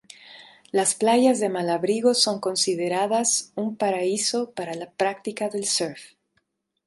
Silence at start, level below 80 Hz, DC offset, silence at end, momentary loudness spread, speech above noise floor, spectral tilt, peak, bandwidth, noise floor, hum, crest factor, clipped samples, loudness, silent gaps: 0.25 s; -74 dBFS; under 0.1%; 0.8 s; 11 LU; 49 dB; -2.5 dB/octave; -6 dBFS; 12 kHz; -72 dBFS; none; 18 dB; under 0.1%; -23 LUFS; none